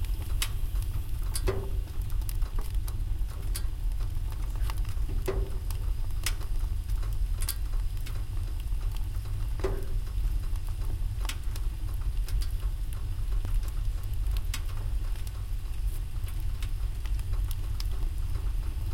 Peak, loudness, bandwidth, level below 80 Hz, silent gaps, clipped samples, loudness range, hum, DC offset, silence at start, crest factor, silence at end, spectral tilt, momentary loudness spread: -12 dBFS; -35 LUFS; 17 kHz; -30 dBFS; none; under 0.1%; 1 LU; none; under 0.1%; 0 s; 18 dB; 0 s; -5 dB/octave; 3 LU